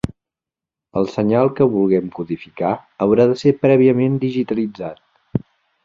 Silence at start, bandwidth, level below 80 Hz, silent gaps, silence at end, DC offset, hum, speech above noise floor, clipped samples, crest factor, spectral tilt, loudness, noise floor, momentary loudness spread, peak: 0.05 s; 7.6 kHz; -50 dBFS; none; 0.45 s; under 0.1%; none; 71 dB; under 0.1%; 16 dB; -8.5 dB/octave; -18 LUFS; -87 dBFS; 13 LU; -2 dBFS